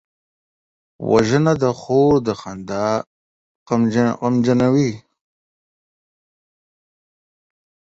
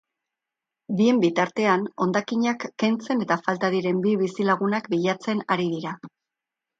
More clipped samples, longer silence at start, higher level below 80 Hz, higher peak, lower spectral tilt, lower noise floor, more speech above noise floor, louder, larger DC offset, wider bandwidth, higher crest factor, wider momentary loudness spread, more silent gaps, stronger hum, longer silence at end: neither; about the same, 1 s vs 0.9 s; first, -52 dBFS vs -72 dBFS; first, 0 dBFS vs -6 dBFS; about the same, -7 dB/octave vs -6 dB/octave; about the same, under -90 dBFS vs -87 dBFS; first, over 73 dB vs 64 dB; first, -18 LUFS vs -24 LUFS; neither; about the same, 8 kHz vs 7.8 kHz; about the same, 20 dB vs 18 dB; first, 11 LU vs 6 LU; first, 3.07-3.66 s vs none; neither; first, 2.95 s vs 0.7 s